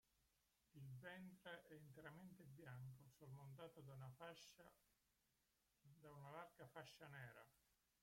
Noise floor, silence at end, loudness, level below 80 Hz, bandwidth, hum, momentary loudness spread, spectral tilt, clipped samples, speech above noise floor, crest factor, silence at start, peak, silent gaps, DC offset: -87 dBFS; 0.3 s; -62 LUFS; -88 dBFS; 16.5 kHz; none; 5 LU; -5.5 dB/octave; under 0.1%; 26 dB; 20 dB; 0.15 s; -42 dBFS; none; under 0.1%